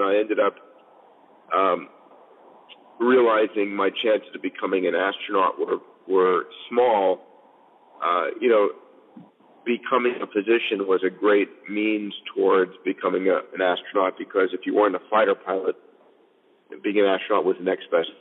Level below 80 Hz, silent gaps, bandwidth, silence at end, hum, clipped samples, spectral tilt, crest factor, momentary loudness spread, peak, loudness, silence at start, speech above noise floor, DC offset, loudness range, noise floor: under -90 dBFS; none; 4.1 kHz; 0.1 s; none; under 0.1%; -8 dB/octave; 16 dB; 8 LU; -6 dBFS; -23 LUFS; 0 s; 37 dB; under 0.1%; 2 LU; -60 dBFS